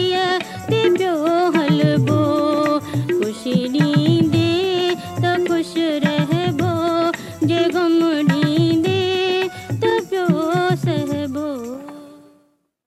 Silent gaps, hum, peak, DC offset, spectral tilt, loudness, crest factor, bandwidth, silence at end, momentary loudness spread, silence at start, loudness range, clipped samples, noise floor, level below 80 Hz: none; none; -4 dBFS; under 0.1%; -6.5 dB/octave; -18 LUFS; 14 dB; 13.5 kHz; 0.7 s; 6 LU; 0 s; 2 LU; under 0.1%; -60 dBFS; -58 dBFS